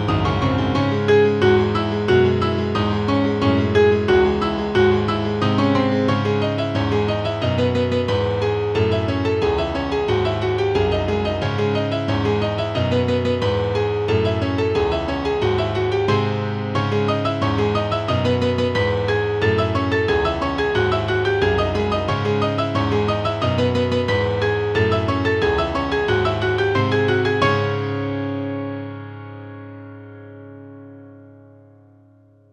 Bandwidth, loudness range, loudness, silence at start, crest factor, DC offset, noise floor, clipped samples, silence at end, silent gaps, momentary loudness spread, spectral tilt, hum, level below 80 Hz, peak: 8.8 kHz; 3 LU; -19 LUFS; 0 s; 16 dB; under 0.1%; -52 dBFS; under 0.1%; 1.2 s; none; 7 LU; -7 dB/octave; none; -38 dBFS; -4 dBFS